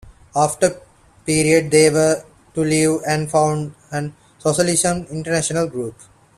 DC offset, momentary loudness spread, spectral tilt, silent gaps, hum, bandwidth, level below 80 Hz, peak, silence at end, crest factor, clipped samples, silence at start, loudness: under 0.1%; 13 LU; -4.5 dB/octave; none; none; 14 kHz; -50 dBFS; 0 dBFS; 0.45 s; 18 dB; under 0.1%; 0.05 s; -18 LUFS